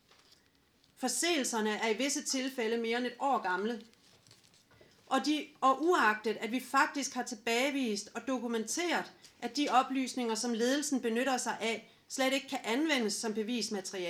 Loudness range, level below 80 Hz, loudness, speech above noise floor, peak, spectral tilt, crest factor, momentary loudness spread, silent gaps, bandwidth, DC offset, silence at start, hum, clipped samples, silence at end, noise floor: 3 LU; -84 dBFS; -32 LUFS; 36 dB; -14 dBFS; -2 dB/octave; 20 dB; 7 LU; none; 17 kHz; under 0.1%; 1 s; none; under 0.1%; 0 s; -69 dBFS